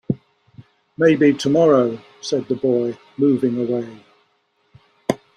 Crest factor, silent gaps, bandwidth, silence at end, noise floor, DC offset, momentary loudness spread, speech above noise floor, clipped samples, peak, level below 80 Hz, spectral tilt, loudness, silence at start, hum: 20 dB; none; 11.5 kHz; 0.2 s; -65 dBFS; under 0.1%; 13 LU; 47 dB; under 0.1%; 0 dBFS; -62 dBFS; -6.5 dB/octave; -19 LUFS; 0.1 s; none